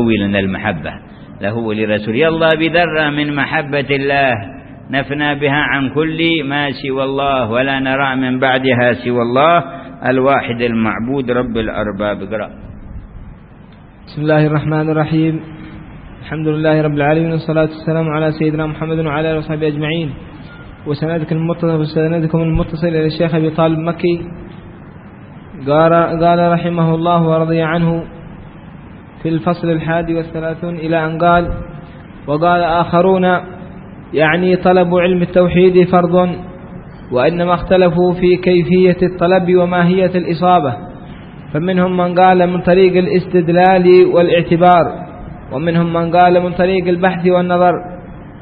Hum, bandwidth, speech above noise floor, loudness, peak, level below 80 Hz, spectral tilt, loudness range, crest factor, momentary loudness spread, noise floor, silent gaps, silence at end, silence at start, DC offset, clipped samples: none; 5 kHz; 25 dB; -14 LUFS; 0 dBFS; -38 dBFS; -11 dB/octave; 6 LU; 14 dB; 19 LU; -38 dBFS; none; 0 s; 0 s; under 0.1%; under 0.1%